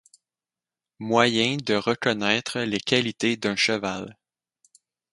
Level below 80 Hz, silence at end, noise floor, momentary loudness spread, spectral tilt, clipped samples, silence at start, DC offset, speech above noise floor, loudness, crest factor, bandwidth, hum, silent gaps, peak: -64 dBFS; 1 s; under -90 dBFS; 10 LU; -4 dB/octave; under 0.1%; 1 s; under 0.1%; over 66 dB; -23 LUFS; 24 dB; 11.5 kHz; none; none; -2 dBFS